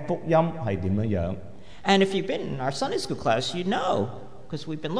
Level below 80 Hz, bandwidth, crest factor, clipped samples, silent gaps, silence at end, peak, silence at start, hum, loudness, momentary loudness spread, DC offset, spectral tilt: -52 dBFS; 11 kHz; 18 dB; under 0.1%; none; 0 s; -8 dBFS; 0 s; none; -26 LUFS; 14 LU; 1%; -5.5 dB/octave